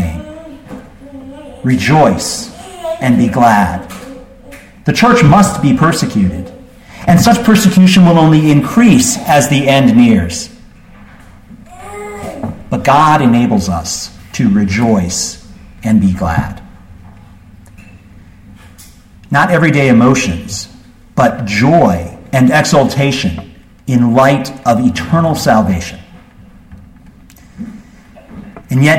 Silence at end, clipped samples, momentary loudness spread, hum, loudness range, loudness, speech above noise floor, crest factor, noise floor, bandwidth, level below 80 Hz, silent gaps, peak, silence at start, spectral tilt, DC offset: 0 s; under 0.1%; 22 LU; none; 9 LU; -10 LUFS; 29 dB; 12 dB; -39 dBFS; 16.5 kHz; -36 dBFS; none; 0 dBFS; 0 s; -5.5 dB/octave; under 0.1%